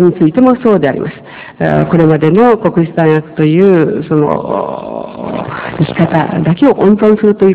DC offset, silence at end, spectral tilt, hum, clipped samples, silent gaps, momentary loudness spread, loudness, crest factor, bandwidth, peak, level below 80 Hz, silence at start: under 0.1%; 0 s; -12 dB/octave; none; 3%; none; 12 LU; -10 LUFS; 10 dB; 4 kHz; 0 dBFS; -42 dBFS; 0 s